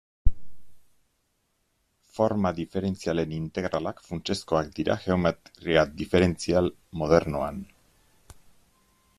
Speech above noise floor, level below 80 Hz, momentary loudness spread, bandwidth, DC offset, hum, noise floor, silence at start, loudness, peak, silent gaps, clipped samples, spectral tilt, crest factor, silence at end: 47 dB; -40 dBFS; 10 LU; 13.5 kHz; under 0.1%; none; -73 dBFS; 0.25 s; -27 LUFS; -4 dBFS; none; under 0.1%; -6 dB/octave; 22 dB; 1.55 s